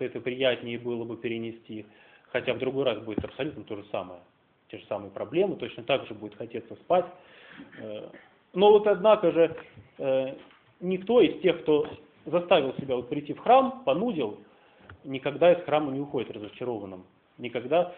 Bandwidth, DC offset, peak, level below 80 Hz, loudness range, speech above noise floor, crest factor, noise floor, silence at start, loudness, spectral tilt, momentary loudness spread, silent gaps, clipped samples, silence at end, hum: 4.2 kHz; under 0.1%; -8 dBFS; -66 dBFS; 8 LU; 26 dB; 20 dB; -53 dBFS; 0 s; -27 LUFS; -4 dB/octave; 20 LU; none; under 0.1%; 0 s; none